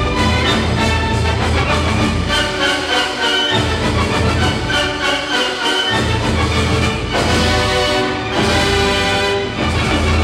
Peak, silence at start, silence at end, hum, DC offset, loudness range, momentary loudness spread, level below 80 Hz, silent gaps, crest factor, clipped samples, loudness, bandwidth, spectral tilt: -2 dBFS; 0 s; 0 s; none; under 0.1%; 1 LU; 3 LU; -26 dBFS; none; 14 dB; under 0.1%; -15 LUFS; 15 kHz; -4.5 dB/octave